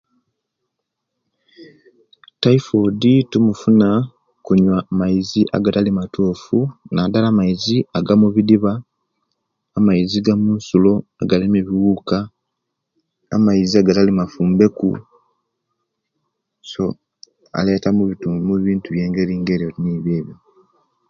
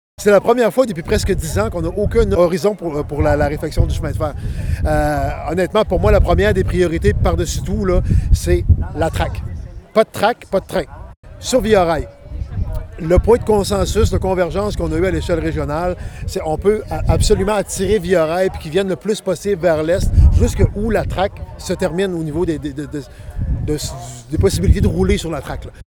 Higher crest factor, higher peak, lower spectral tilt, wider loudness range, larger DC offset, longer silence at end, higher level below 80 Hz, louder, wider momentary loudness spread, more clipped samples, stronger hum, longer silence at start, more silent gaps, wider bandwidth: about the same, 18 dB vs 16 dB; about the same, 0 dBFS vs -2 dBFS; first, -7.5 dB/octave vs -6 dB/octave; about the same, 5 LU vs 3 LU; neither; first, 0.75 s vs 0.1 s; second, -48 dBFS vs -22 dBFS; about the same, -17 LUFS vs -17 LUFS; about the same, 9 LU vs 11 LU; neither; neither; first, 1.6 s vs 0.2 s; second, none vs 11.17-11.23 s; second, 7.2 kHz vs 19.5 kHz